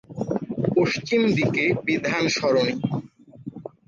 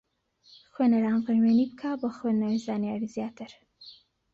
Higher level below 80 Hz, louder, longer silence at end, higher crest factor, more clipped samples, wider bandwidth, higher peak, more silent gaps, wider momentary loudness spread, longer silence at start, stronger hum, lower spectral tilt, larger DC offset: first, -58 dBFS vs -70 dBFS; first, -23 LUFS vs -27 LUFS; second, 0.2 s vs 0.4 s; about the same, 14 dB vs 14 dB; neither; about the same, 7.4 kHz vs 7.6 kHz; first, -8 dBFS vs -14 dBFS; neither; first, 16 LU vs 13 LU; second, 0.1 s vs 0.8 s; neither; second, -5.5 dB/octave vs -7.5 dB/octave; neither